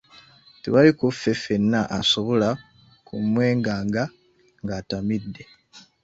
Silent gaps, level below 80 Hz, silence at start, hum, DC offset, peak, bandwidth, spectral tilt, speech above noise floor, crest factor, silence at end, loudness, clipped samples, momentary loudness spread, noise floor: none; -54 dBFS; 0.65 s; none; under 0.1%; -2 dBFS; 8 kHz; -5.5 dB/octave; 30 dB; 20 dB; 0.25 s; -22 LUFS; under 0.1%; 17 LU; -51 dBFS